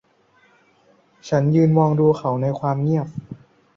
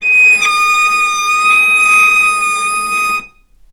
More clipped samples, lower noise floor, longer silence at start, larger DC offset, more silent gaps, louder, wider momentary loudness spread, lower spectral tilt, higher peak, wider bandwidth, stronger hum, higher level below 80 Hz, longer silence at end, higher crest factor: neither; first, -58 dBFS vs -40 dBFS; first, 1.25 s vs 0 s; neither; neither; second, -19 LUFS vs -9 LUFS; first, 18 LU vs 8 LU; first, -9 dB/octave vs 1.5 dB/octave; second, -4 dBFS vs 0 dBFS; second, 7 kHz vs 18.5 kHz; neither; second, -58 dBFS vs -50 dBFS; about the same, 0.4 s vs 0.45 s; about the same, 16 dB vs 12 dB